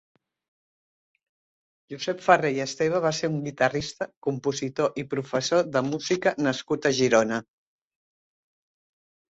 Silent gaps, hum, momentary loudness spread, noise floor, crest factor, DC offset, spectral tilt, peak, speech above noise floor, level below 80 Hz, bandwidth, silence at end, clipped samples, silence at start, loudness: 4.17-4.22 s; none; 10 LU; under -90 dBFS; 24 dB; under 0.1%; -4.5 dB/octave; -4 dBFS; over 65 dB; -64 dBFS; 8 kHz; 1.95 s; under 0.1%; 1.9 s; -25 LUFS